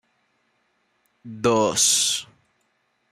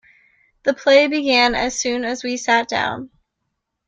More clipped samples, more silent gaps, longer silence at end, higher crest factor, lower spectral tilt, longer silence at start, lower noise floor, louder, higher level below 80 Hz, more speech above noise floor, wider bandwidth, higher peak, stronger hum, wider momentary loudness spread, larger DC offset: neither; neither; about the same, 0.9 s vs 0.8 s; about the same, 20 dB vs 18 dB; about the same, -2 dB/octave vs -2 dB/octave; first, 1.25 s vs 0.65 s; second, -69 dBFS vs -76 dBFS; about the same, -19 LUFS vs -18 LUFS; second, -62 dBFS vs -50 dBFS; second, 49 dB vs 58 dB; first, 15.5 kHz vs 8.8 kHz; second, -6 dBFS vs 0 dBFS; neither; about the same, 11 LU vs 10 LU; neither